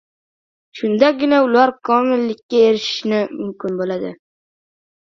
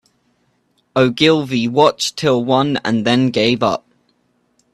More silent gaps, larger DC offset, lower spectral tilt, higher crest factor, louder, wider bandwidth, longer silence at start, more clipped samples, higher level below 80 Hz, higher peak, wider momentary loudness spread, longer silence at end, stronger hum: first, 2.43-2.49 s vs none; neither; about the same, -5.5 dB/octave vs -5 dB/octave; about the same, 18 dB vs 16 dB; about the same, -17 LUFS vs -15 LUFS; second, 7.4 kHz vs 13 kHz; second, 0.75 s vs 0.95 s; neither; second, -64 dBFS vs -56 dBFS; about the same, 0 dBFS vs 0 dBFS; first, 11 LU vs 5 LU; about the same, 0.9 s vs 0.95 s; neither